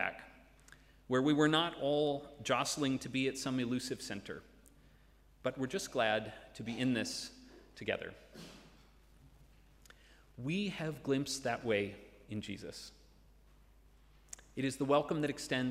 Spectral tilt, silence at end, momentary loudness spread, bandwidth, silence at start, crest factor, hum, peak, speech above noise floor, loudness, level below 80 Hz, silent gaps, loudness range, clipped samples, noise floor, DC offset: -4.5 dB/octave; 0 s; 20 LU; 16 kHz; 0 s; 22 dB; none; -16 dBFS; 28 dB; -36 LUFS; -64 dBFS; none; 10 LU; under 0.1%; -64 dBFS; under 0.1%